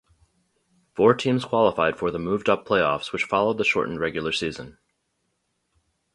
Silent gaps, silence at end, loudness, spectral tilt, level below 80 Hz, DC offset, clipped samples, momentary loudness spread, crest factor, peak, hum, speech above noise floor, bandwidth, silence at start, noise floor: none; 1.45 s; -23 LUFS; -5.5 dB/octave; -56 dBFS; under 0.1%; under 0.1%; 7 LU; 22 dB; -4 dBFS; none; 51 dB; 11.5 kHz; 0.95 s; -74 dBFS